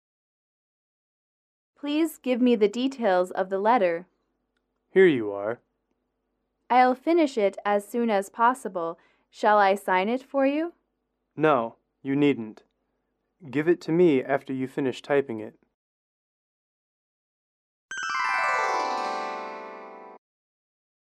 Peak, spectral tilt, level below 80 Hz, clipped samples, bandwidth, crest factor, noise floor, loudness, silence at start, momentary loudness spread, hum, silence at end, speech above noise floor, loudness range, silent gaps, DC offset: -8 dBFS; -5.5 dB/octave; -78 dBFS; under 0.1%; 13.5 kHz; 18 dB; -78 dBFS; -25 LUFS; 1.85 s; 15 LU; none; 0.9 s; 54 dB; 6 LU; 15.74-17.89 s; under 0.1%